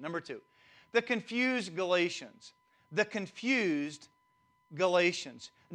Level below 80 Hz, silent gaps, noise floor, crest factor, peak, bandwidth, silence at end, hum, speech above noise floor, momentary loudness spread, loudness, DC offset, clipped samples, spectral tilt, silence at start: -82 dBFS; none; -72 dBFS; 20 dB; -14 dBFS; 10.5 kHz; 0 s; none; 39 dB; 18 LU; -32 LUFS; under 0.1%; under 0.1%; -4 dB/octave; 0 s